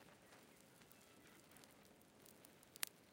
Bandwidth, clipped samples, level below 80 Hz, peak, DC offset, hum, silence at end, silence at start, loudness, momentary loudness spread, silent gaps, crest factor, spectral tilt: 16.5 kHz; under 0.1%; -88 dBFS; -16 dBFS; under 0.1%; none; 0 s; 0 s; -58 LUFS; 17 LU; none; 44 dB; -1 dB/octave